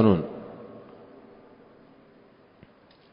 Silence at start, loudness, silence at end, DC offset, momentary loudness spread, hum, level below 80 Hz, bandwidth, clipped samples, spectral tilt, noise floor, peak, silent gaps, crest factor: 0 s; -29 LUFS; 2.35 s; under 0.1%; 27 LU; none; -54 dBFS; 5.2 kHz; under 0.1%; -12 dB/octave; -56 dBFS; -6 dBFS; none; 24 dB